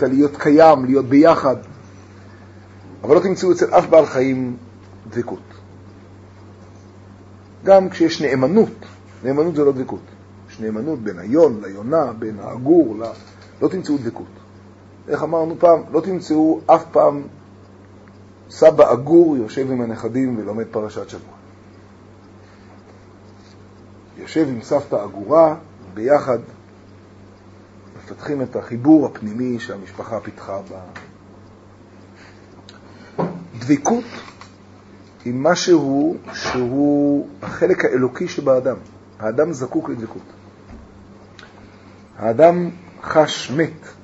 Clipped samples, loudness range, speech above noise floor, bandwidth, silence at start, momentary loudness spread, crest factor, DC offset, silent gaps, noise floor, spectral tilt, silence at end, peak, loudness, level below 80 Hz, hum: under 0.1%; 10 LU; 27 dB; 8 kHz; 0 s; 19 LU; 18 dB; under 0.1%; none; -44 dBFS; -6.5 dB/octave; 0.15 s; 0 dBFS; -17 LUFS; -56 dBFS; none